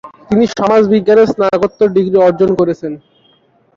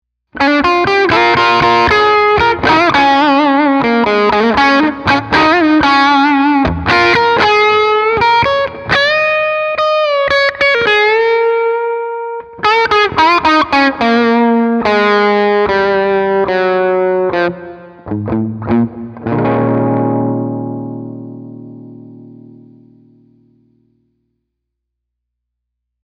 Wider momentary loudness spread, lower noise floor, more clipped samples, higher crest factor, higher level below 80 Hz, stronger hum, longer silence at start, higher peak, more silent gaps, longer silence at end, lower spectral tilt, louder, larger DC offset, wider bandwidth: second, 7 LU vs 11 LU; second, -52 dBFS vs -75 dBFS; neither; about the same, 10 dB vs 12 dB; second, -48 dBFS vs -42 dBFS; neither; second, 0.05 s vs 0.35 s; about the same, -2 dBFS vs 0 dBFS; neither; second, 0.8 s vs 3.75 s; first, -7 dB/octave vs -5.5 dB/octave; about the same, -12 LUFS vs -11 LUFS; neither; second, 7.4 kHz vs 10 kHz